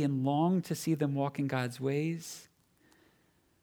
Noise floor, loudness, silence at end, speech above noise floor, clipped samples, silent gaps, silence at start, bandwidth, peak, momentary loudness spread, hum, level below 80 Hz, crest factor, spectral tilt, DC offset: -70 dBFS; -32 LUFS; 1.2 s; 38 dB; under 0.1%; none; 0 s; 19 kHz; -16 dBFS; 10 LU; none; -76 dBFS; 16 dB; -6.5 dB/octave; under 0.1%